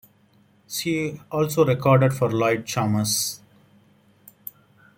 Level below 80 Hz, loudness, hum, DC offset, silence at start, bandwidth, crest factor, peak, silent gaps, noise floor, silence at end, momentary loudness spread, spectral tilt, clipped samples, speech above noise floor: -60 dBFS; -22 LUFS; none; under 0.1%; 0.7 s; 17 kHz; 20 dB; -4 dBFS; none; -59 dBFS; 1.6 s; 22 LU; -5 dB/octave; under 0.1%; 37 dB